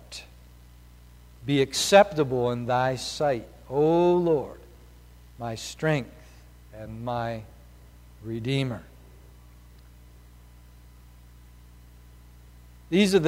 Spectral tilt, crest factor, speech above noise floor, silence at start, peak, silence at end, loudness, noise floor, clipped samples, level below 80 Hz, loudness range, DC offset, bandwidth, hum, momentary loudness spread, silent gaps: -5 dB/octave; 24 dB; 26 dB; 0.1 s; -4 dBFS; 0 s; -25 LUFS; -50 dBFS; under 0.1%; -52 dBFS; 13 LU; under 0.1%; 16 kHz; 60 Hz at -50 dBFS; 21 LU; none